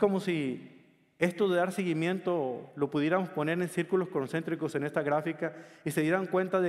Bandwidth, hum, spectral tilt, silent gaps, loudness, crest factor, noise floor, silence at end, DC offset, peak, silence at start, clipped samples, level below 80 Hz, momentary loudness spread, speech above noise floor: 14.5 kHz; none; -6.5 dB/octave; none; -31 LUFS; 20 dB; -58 dBFS; 0 s; under 0.1%; -12 dBFS; 0 s; under 0.1%; -74 dBFS; 7 LU; 28 dB